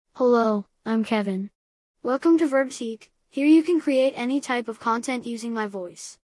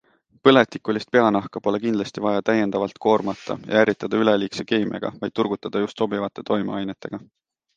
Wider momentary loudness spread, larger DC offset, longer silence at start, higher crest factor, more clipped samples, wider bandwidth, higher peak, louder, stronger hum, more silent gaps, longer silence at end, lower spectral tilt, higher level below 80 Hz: first, 15 LU vs 10 LU; neither; second, 0.15 s vs 0.45 s; second, 16 dB vs 22 dB; neither; first, 12 kHz vs 9 kHz; second, -8 dBFS vs 0 dBFS; about the same, -23 LUFS vs -22 LUFS; neither; first, 1.55-1.94 s vs none; second, 0.1 s vs 0.5 s; about the same, -5.5 dB/octave vs -6 dB/octave; second, -74 dBFS vs -62 dBFS